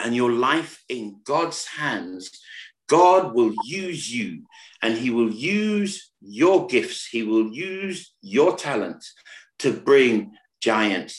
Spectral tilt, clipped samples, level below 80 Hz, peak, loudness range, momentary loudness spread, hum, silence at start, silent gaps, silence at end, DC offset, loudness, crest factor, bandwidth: -4.5 dB/octave; under 0.1%; -70 dBFS; -4 dBFS; 2 LU; 19 LU; none; 0 s; none; 0 s; under 0.1%; -22 LUFS; 18 dB; 12 kHz